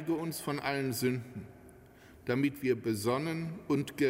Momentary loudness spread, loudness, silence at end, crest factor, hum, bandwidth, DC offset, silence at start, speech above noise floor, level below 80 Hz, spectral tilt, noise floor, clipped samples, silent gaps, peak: 12 LU; -34 LUFS; 0 s; 18 dB; none; 16 kHz; under 0.1%; 0 s; 23 dB; -66 dBFS; -5.5 dB/octave; -56 dBFS; under 0.1%; none; -16 dBFS